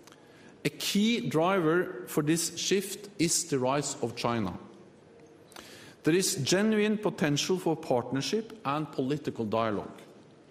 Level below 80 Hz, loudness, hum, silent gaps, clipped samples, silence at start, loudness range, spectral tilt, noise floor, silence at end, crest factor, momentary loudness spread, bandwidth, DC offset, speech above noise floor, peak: -68 dBFS; -29 LUFS; none; none; under 0.1%; 0.45 s; 3 LU; -4 dB/octave; -54 dBFS; 0.3 s; 18 dB; 10 LU; 15.5 kHz; under 0.1%; 26 dB; -12 dBFS